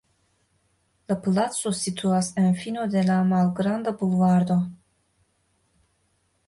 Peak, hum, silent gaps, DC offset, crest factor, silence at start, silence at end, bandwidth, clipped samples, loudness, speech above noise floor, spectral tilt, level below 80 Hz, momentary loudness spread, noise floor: -10 dBFS; none; none; under 0.1%; 14 dB; 1.1 s; 1.7 s; 11.5 kHz; under 0.1%; -23 LUFS; 47 dB; -6 dB/octave; -62 dBFS; 6 LU; -69 dBFS